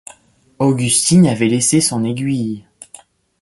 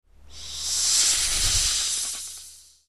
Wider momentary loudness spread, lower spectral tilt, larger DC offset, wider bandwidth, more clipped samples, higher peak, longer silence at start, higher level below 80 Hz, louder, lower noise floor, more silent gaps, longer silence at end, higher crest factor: second, 9 LU vs 18 LU; first, -4.5 dB/octave vs 1.5 dB/octave; second, under 0.1% vs 0.4%; second, 12 kHz vs 14.5 kHz; neither; first, -2 dBFS vs -8 dBFS; first, 0.6 s vs 0.3 s; second, -52 dBFS vs -40 dBFS; first, -15 LUFS vs -21 LUFS; about the same, -48 dBFS vs -47 dBFS; neither; first, 0.8 s vs 0.2 s; about the same, 14 dB vs 18 dB